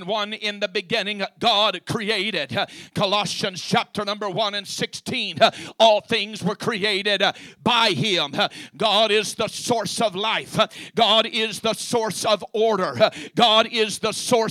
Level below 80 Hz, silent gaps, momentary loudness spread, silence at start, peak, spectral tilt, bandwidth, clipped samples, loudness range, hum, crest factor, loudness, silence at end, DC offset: -64 dBFS; none; 9 LU; 0 s; -2 dBFS; -3 dB/octave; 15 kHz; under 0.1%; 3 LU; none; 20 dB; -21 LUFS; 0 s; under 0.1%